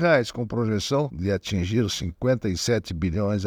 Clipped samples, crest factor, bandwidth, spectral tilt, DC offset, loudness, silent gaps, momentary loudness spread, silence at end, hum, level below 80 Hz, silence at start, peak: under 0.1%; 18 dB; 19.5 kHz; -5.5 dB/octave; under 0.1%; -25 LUFS; none; 4 LU; 0 s; none; -46 dBFS; 0 s; -6 dBFS